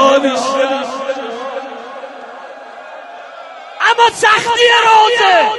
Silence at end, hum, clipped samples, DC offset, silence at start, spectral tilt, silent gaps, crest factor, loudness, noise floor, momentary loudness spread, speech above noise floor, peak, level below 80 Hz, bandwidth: 0 s; none; under 0.1%; under 0.1%; 0 s; -1.5 dB/octave; none; 14 dB; -11 LUFS; -32 dBFS; 23 LU; 22 dB; 0 dBFS; -62 dBFS; 11.5 kHz